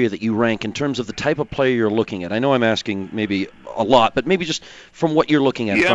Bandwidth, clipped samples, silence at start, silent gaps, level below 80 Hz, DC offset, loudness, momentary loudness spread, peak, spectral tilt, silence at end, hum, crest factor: 9.8 kHz; under 0.1%; 0 s; none; -50 dBFS; under 0.1%; -19 LUFS; 8 LU; 0 dBFS; -5.5 dB/octave; 0 s; none; 18 dB